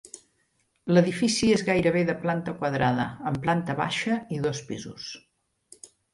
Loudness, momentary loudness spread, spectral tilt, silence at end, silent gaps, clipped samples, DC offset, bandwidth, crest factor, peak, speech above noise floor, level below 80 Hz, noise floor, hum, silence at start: -25 LUFS; 17 LU; -5.5 dB/octave; 0.25 s; none; under 0.1%; under 0.1%; 11.5 kHz; 20 dB; -6 dBFS; 46 dB; -56 dBFS; -71 dBFS; none; 0.15 s